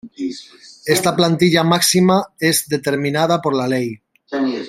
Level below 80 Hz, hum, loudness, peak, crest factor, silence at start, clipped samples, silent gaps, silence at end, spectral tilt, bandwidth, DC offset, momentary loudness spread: -58 dBFS; none; -16 LUFS; 0 dBFS; 16 dB; 0.05 s; under 0.1%; none; 0 s; -4.5 dB/octave; 16 kHz; under 0.1%; 14 LU